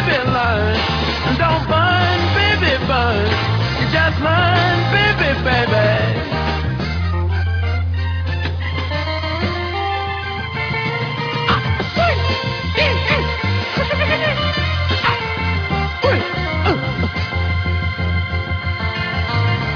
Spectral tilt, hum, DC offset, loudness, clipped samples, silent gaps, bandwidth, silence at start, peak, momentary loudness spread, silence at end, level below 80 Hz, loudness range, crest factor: -6.5 dB/octave; none; under 0.1%; -17 LUFS; under 0.1%; none; 5.4 kHz; 0 s; -2 dBFS; 6 LU; 0 s; -30 dBFS; 5 LU; 16 dB